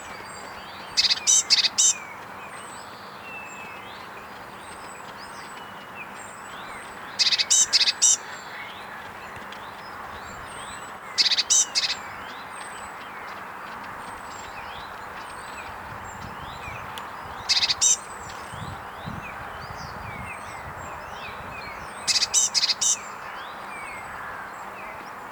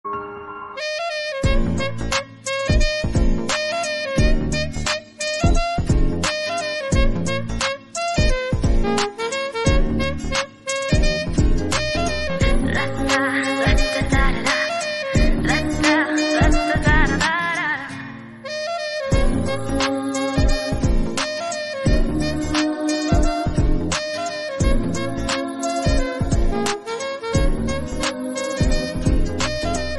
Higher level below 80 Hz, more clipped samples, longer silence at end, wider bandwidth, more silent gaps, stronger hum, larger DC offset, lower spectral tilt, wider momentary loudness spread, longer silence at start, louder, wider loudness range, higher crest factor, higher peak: second, -56 dBFS vs -24 dBFS; neither; about the same, 0 s vs 0 s; first, over 20 kHz vs 11.5 kHz; neither; neither; second, under 0.1% vs 1%; second, 1 dB/octave vs -4.5 dB/octave; first, 20 LU vs 6 LU; about the same, 0 s vs 0.05 s; about the same, -21 LUFS vs -21 LUFS; first, 15 LU vs 4 LU; first, 22 dB vs 16 dB; about the same, -6 dBFS vs -4 dBFS